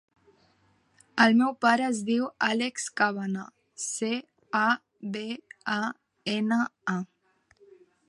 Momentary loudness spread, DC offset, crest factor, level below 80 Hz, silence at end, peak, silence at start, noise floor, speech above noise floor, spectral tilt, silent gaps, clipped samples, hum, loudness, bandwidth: 14 LU; under 0.1%; 22 dB; -78 dBFS; 1.05 s; -6 dBFS; 1.15 s; -66 dBFS; 40 dB; -4 dB/octave; none; under 0.1%; none; -28 LUFS; 11.5 kHz